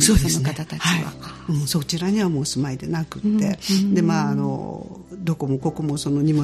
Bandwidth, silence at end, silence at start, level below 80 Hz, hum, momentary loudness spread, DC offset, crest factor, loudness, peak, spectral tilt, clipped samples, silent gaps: 14.5 kHz; 0 s; 0 s; -36 dBFS; none; 11 LU; under 0.1%; 20 dB; -22 LUFS; -2 dBFS; -5 dB/octave; under 0.1%; none